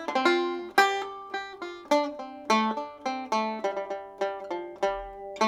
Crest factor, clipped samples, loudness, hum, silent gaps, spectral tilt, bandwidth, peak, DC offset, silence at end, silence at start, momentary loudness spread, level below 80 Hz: 24 dB; under 0.1%; -28 LUFS; none; none; -3 dB/octave; 17 kHz; -4 dBFS; under 0.1%; 0 s; 0 s; 13 LU; -60 dBFS